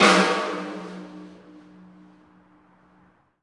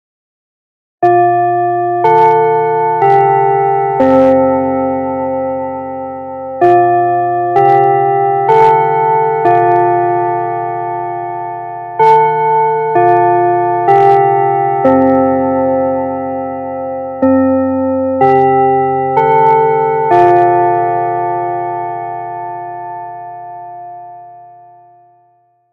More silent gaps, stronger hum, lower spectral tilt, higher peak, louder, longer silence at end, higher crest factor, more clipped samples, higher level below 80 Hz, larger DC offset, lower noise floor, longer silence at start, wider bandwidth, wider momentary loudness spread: neither; neither; second, -3.5 dB/octave vs -9 dB/octave; about the same, -2 dBFS vs 0 dBFS; second, -23 LUFS vs -11 LUFS; first, 2.15 s vs 1.25 s; first, 24 dB vs 12 dB; neither; second, -74 dBFS vs -56 dBFS; neither; first, -60 dBFS vs -54 dBFS; second, 0 s vs 1 s; first, 11.5 kHz vs 6.2 kHz; first, 27 LU vs 14 LU